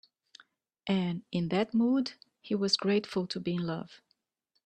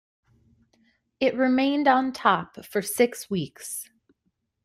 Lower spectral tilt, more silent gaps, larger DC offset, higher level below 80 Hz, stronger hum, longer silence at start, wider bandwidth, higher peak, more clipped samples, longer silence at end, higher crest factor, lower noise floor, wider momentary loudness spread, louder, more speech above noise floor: first, -6 dB/octave vs -4 dB/octave; neither; neither; about the same, -70 dBFS vs -66 dBFS; neither; second, 0.85 s vs 1.2 s; second, 9.4 kHz vs 16 kHz; second, -14 dBFS vs -6 dBFS; neither; about the same, 0.7 s vs 0.8 s; about the same, 18 dB vs 22 dB; first, -80 dBFS vs -75 dBFS; about the same, 11 LU vs 13 LU; second, -31 LUFS vs -24 LUFS; about the same, 50 dB vs 52 dB